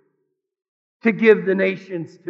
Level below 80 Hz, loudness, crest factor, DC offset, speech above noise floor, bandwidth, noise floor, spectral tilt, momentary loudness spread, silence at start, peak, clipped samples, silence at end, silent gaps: under -90 dBFS; -18 LUFS; 20 dB; under 0.1%; 55 dB; 6.6 kHz; -74 dBFS; -8 dB/octave; 13 LU; 1.05 s; 0 dBFS; under 0.1%; 0 s; none